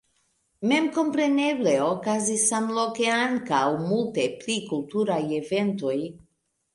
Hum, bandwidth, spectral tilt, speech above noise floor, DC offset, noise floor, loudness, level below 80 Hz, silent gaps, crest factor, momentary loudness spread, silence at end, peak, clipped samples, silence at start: none; 11.5 kHz; -4 dB/octave; 46 dB; under 0.1%; -70 dBFS; -25 LUFS; -68 dBFS; none; 16 dB; 6 LU; 0.6 s; -10 dBFS; under 0.1%; 0.6 s